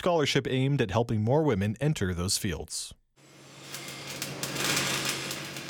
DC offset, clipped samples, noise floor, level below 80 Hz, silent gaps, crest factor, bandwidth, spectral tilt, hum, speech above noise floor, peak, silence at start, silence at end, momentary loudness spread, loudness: under 0.1%; under 0.1%; -55 dBFS; -54 dBFS; none; 20 dB; 19 kHz; -4.5 dB/octave; none; 28 dB; -10 dBFS; 0 s; 0 s; 13 LU; -28 LUFS